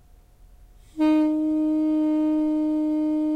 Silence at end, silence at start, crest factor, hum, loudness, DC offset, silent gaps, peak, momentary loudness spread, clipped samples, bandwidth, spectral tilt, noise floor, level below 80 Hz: 0 s; 0.95 s; 10 dB; none; -23 LUFS; under 0.1%; none; -14 dBFS; 3 LU; under 0.1%; 4.9 kHz; -6.5 dB/octave; -51 dBFS; -54 dBFS